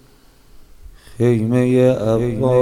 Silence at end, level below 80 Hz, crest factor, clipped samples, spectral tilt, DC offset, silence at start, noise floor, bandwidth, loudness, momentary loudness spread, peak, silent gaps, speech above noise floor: 0 s; -42 dBFS; 14 dB; under 0.1%; -8.5 dB/octave; under 0.1%; 0.55 s; -48 dBFS; 13 kHz; -16 LUFS; 4 LU; -4 dBFS; none; 34 dB